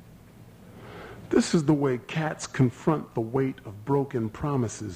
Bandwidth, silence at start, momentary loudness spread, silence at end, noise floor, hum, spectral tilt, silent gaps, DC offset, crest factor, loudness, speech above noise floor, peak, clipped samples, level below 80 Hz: 15.5 kHz; 0 s; 20 LU; 0 s; -50 dBFS; none; -6.5 dB/octave; none; under 0.1%; 18 dB; -27 LUFS; 24 dB; -10 dBFS; under 0.1%; -56 dBFS